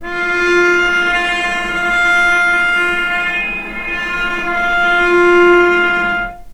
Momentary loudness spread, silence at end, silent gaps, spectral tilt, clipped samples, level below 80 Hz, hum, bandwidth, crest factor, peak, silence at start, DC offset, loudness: 8 LU; 0 s; none; -3.5 dB/octave; under 0.1%; -36 dBFS; none; 12.5 kHz; 14 dB; 0 dBFS; 0 s; under 0.1%; -13 LUFS